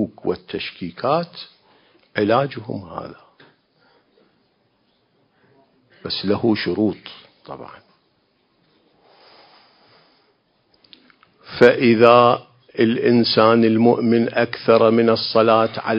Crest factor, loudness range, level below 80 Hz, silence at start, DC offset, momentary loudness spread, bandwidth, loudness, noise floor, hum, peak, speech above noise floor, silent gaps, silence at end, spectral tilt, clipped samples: 20 dB; 13 LU; -58 dBFS; 0 s; under 0.1%; 21 LU; 5.8 kHz; -17 LUFS; -64 dBFS; none; 0 dBFS; 47 dB; none; 0 s; -8 dB/octave; under 0.1%